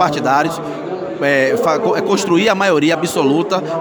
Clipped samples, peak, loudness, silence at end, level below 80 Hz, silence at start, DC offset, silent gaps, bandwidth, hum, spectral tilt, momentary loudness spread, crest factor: under 0.1%; 0 dBFS; -15 LUFS; 0 s; -58 dBFS; 0 s; under 0.1%; none; over 20 kHz; none; -4.5 dB/octave; 9 LU; 14 dB